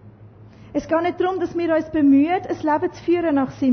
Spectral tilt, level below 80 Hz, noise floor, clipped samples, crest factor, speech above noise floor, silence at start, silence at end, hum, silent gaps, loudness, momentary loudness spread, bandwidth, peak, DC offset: -7 dB/octave; -52 dBFS; -45 dBFS; under 0.1%; 12 dB; 25 dB; 0.05 s; 0 s; none; none; -20 LUFS; 7 LU; 6.4 kHz; -8 dBFS; under 0.1%